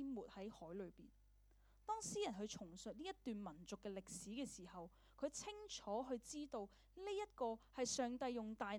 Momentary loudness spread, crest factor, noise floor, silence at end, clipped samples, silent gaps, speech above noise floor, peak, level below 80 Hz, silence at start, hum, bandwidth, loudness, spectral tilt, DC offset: 11 LU; 20 dB; -71 dBFS; 0 s; under 0.1%; none; 23 dB; -30 dBFS; -72 dBFS; 0 s; 50 Hz at -70 dBFS; 19 kHz; -49 LUFS; -3.5 dB/octave; under 0.1%